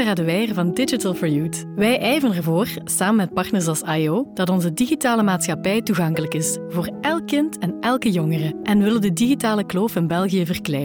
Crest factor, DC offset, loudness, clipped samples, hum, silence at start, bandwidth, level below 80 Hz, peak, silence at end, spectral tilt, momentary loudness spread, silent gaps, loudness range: 10 dB; under 0.1%; -20 LUFS; under 0.1%; none; 0 s; 19 kHz; -56 dBFS; -8 dBFS; 0 s; -5 dB/octave; 4 LU; none; 1 LU